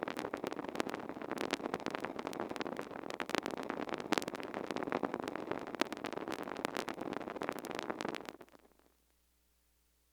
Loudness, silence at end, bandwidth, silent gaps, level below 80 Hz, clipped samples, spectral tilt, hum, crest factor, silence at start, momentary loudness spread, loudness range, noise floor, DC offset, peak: -41 LUFS; 1.45 s; over 20 kHz; none; -74 dBFS; under 0.1%; -4 dB/octave; none; 32 dB; 0 s; 5 LU; 4 LU; -74 dBFS; under 0.1%; -8 dBFS